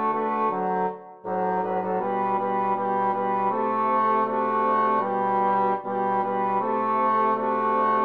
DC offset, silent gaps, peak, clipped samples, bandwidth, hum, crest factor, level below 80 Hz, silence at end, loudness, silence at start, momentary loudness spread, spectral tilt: 0.1%; none; -12 dBFS; under 0.1%; 5.4 kHz; none; 12 dB; -74 dBFS; 0 s; -24 LUFS; 0 s; 4 LU; -9 dB/octave